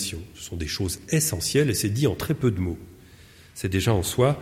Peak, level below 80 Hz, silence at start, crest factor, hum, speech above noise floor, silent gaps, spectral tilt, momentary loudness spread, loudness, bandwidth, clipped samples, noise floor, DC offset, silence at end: -8 dBFS; -44 dBFS; 0 s; 18 dB; none; 25 dB; none; -5 dB/octave; 12 LU; -25 LUFS; 16.5 kHz; under 0.1%; -50 dBFS; under 0.1%; 0 s